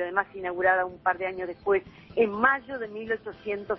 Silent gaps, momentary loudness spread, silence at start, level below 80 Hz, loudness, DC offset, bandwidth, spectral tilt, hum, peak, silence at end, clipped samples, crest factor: none; 11 LU; 0 s; -60 dBFS; -27 LUFS; under 0.1%; 5.6 kHz; -8 dB/octave; none; -8 dBFS; 0 s; under 0.1%; 20 dB